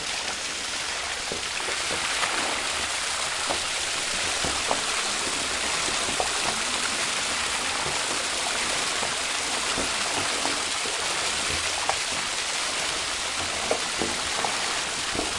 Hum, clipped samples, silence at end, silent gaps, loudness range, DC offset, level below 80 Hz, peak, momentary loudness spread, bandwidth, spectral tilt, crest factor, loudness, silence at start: none; under 0.1%; 0 s; none; 1 LU; under 0.1%; -52 dBFS; -6 dBFS; 2 LU; 11.5 kHz; 0 dB/octave; 22 dB; -25 LUFS; 0 s